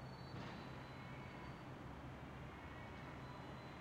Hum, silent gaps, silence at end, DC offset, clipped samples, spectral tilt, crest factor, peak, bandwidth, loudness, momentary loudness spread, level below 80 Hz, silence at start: none; none; 0 s; under 0.1%; under 0.1%; -6.5 dB/octave; 14 dB; -38 dBFS; 16 kHz; -53 LUFS; 2 LU; -64 dBFS; 0 s